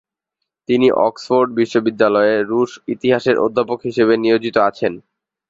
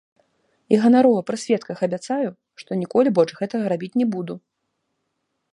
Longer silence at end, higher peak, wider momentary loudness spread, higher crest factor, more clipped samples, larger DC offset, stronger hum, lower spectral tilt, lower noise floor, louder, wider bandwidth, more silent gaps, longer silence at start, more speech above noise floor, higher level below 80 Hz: second, 0.5 s vs 1.15 s; about the same, -2 dBFS vs -2 dBFS; second, 7 LU vs 13 LU; about the same, 16 dB vs 18 dB; neither; neither; neither; about the same, -6 dB/octave vs -6.5 dB/octave; first, -79 dBFS vs -75 dBFS; first, -16 LUFS vs -21 LUFS; second, 7.8 kHz vs 11 kHz; neither; about the same, 0.7 s vs 0.7 s; first, 63 dB vs 55 dB; first, -58 dBFS vs -72 dBFS